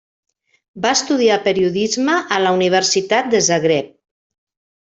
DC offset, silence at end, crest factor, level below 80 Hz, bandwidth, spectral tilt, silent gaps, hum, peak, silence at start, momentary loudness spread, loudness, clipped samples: under 0.1%; 1.1 s; 16 dB; -60 dBFS; 8.4 kHz; -3 dB/octave; none; none; -2 dBFS; 0.75 s; 4 LU; -16 LUFS; under 0.1%